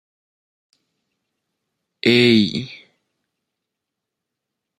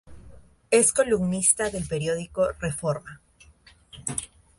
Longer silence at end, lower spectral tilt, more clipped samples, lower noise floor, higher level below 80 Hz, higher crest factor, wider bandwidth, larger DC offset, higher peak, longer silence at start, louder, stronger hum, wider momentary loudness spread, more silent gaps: first, 2.05 s vs 0.3 s; first, -5.5 dB/octave vs -4 dB/octave; neither; first, -82 dBFS vs -55 dBFS; second, -64 dBFS vs -50 dBFS; about the same, 22 dB vs 22 dB; about the same, 12.5 kHz vs 11.5 kHz; neither; about the same, -2 dBFS vs -4 dBFS; first, 2.05 s vs 0.05 s; first, -16 LUFS vs -24 LUFS; neither; first, 16 LU vs 12 LU; neither